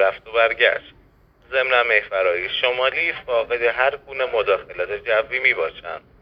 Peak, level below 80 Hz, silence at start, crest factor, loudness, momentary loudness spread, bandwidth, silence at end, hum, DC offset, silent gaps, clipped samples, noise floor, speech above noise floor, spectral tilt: -2 dBFS; -54 dBFS; 0 s; 20 dB; -20 LUFS; 10 LU; 5.6 kHz; 0.25 s; none; under 0.1%; none; under 0.1%; -54 dBFS; 33 dB; -5 dB/octave